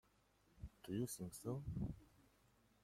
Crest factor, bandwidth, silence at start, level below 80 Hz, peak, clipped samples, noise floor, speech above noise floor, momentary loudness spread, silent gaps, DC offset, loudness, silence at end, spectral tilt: 18 dB; 16.5 kHz; 0.55 s; -64 dBFS; -32 dBFS; under 0.1%; -76 dBFS; 30 dB; 15 LU; none; under 0.1%; -48 LUFS; 0.6 s; -6.5 dB/octave